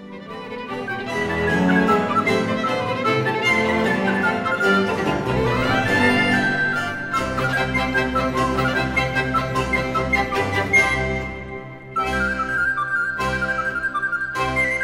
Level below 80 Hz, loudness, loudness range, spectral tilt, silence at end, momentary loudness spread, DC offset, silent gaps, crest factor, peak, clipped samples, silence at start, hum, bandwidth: -38 dBFS; -20 LUFS; 2 LU; -5.5 dB/octave; 0 s; 8 LU; under 0.1%; none; 18 dB; -4 dBFS; under 0.1%; 0 s; none; 16 kHz